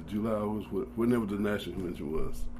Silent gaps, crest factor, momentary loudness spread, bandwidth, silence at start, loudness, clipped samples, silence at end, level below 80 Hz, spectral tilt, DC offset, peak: none; 14 dB; 8 LU; 15 kHz; 0 s; -32 LUFS; under 0.1%; 0 s; -42 dBFS; -7 dB/octave; under 0.1%; -18 dBFS